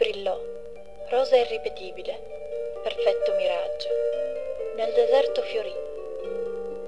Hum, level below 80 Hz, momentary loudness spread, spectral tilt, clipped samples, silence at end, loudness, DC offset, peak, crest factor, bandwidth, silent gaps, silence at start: 50 Hz at -60 dBFS; -58 dBFS; 14 LU; -3.5 dB/octave; under 0.1%; 0 s; -27 LUFS; 0.9%; -8 dBFS; 18 dB; 10.5 kHz; none; 0 s